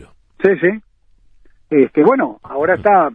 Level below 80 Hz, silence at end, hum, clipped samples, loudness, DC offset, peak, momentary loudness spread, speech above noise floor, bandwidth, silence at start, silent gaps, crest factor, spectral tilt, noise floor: -52 dBFS; 0 s; none; under 0.1%; -15 LUFS; under 0.1%; 0 dBFS; 8 LU; 36 dB; 4.3 kHz; 0.4 s; none; 14 dB; -9.5 dB/octave; -50 dBFS